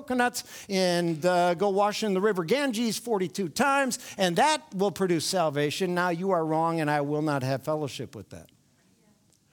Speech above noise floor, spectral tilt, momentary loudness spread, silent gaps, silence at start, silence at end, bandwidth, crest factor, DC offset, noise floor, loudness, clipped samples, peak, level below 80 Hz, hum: 38 dB; -4.5 dB/octave; 6 LU; none; 0 s; 1.1 s; 19.5 kHz; 20 dB; under 0.1%; -64 dBFS; -26 LUFS; under 0.1%; -8 dBFS; -68 dBFS; none